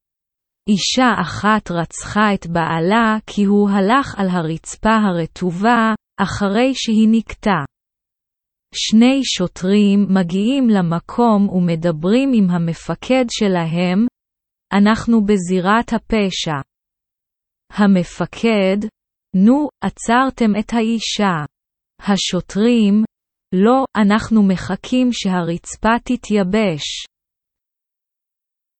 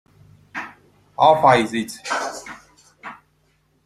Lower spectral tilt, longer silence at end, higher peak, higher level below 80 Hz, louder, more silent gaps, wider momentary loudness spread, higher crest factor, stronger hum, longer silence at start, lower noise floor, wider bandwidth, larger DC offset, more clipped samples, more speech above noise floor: about the same, -5.5 dB/octave vs -4.5 dB/octave; first, 1.75 s vs 0.7 s; about the same, -2 dBFS vs -2 dBFS; first, -44 dBFS vs -60 dBFS; about the same, -16 LUFS vs -18 LUFS; neither; second, 9 LU vs 25 LU; second, 14 dB vs 20 dB; neither; about the same, 0.65 s vs 0.55 s; first, -84 dBFS vs -63 dBFS; second, 8.8 kHz vs 15 kHz; neither; neither; first, 68 dB vs 46 dB